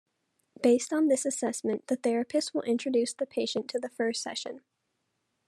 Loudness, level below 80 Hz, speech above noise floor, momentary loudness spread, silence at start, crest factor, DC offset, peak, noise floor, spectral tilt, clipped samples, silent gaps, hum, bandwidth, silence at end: -29 LUFS; -84 dBFS; 51 dB; 9 LU; 0.6 s; 18 dB; under 0.1%; -12 dBFS; -79 dBFS; -3 dB/octave; under 0.1%; none; none; 13 kHz; 0.9 s